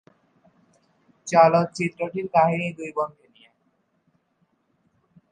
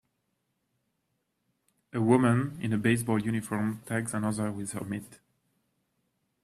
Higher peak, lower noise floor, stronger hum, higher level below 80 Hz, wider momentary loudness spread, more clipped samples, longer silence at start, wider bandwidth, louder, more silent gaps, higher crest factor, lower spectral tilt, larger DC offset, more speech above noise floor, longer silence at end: first, -2 dBFS vs -8 dBFS; second, -69 dBFS vs -79 dBFS; neither; second, -70 dBFS vs -64 dBFS; about the same, 13 LU vs 12 LU; neither; second, 1.25 s vs 1.95 s; second, 9.8 kHz vs 14 kHz; first, -22 LUFS vs -29 LUFS; neither; about the same, 22 dB vs 22 dB; about the same, -6 dB/octave vs -6.5 dB/octave; neither; about the same, 48 dB vs 51 dB; first, 2.25 s vs 1.3 s